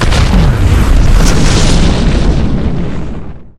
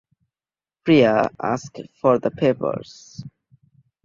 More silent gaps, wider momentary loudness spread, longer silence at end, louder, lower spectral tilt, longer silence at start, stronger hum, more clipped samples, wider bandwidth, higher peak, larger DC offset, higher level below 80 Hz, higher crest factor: neither; second, 10 LU vs 23 LU; second, 0.1 s vs 0.75 s; first, -11 LUFS vs -20 LUFS; about the same, -5.5 dB/octave vs -6.5 dB/octave; second, 0 s vs 0.85 s; neither; first, 0.8% vs under 0.1%; first, 13.5 kHz vs 7.6 kHz; about the same, 0 dBFS vs -2 dBFS; neither; first, -10 dBFS vs -58 dBFS; second, 8 dB vs 20 dB